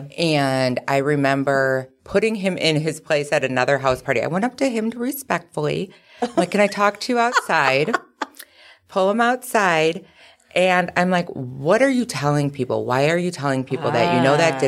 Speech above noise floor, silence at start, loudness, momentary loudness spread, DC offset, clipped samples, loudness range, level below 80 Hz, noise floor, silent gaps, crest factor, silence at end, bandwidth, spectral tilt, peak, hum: 29 dB; 0 s; -20 LUFS; 8 LU; under 0.1%; under 0.1%; 2 LU; -58 dBFS; -49 dBFS; none; 18 dB; 0 s; 16 kHz; -5 dB/octave; -2 dBFS; none